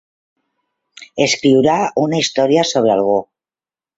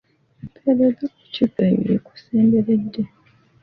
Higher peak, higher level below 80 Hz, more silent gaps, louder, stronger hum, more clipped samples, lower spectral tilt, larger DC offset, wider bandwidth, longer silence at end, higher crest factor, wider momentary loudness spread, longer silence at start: first, -2 dBFS vs -6 dBFS; about the same, -58 dBFS vs -56 dBFS; neither; first, -15 LUFS vs -20 LUFS; neither; neither; second, -4.5 dB/octave vs -10 dB/octave; neither; first, 8 kHz vs 5.6 kHz; first, 0.75 s vs 0.55 s; about the same, 16 dB vs 16 dB; second, 6 LU vs 12 LU; first, 1 s vs 0.45 s